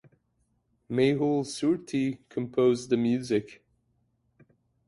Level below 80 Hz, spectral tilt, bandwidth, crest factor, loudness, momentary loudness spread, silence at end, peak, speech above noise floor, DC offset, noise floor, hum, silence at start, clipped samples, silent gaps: -68 dBFS; -6.5 dB/octave; 11.5 kHz; 18 dB; -27 LUFS; 7 LU; 1.35 s; -12 dBFS; 46 dB; under 0.1%; -73 dBFS; none; 0.9 s; under 0.1%; none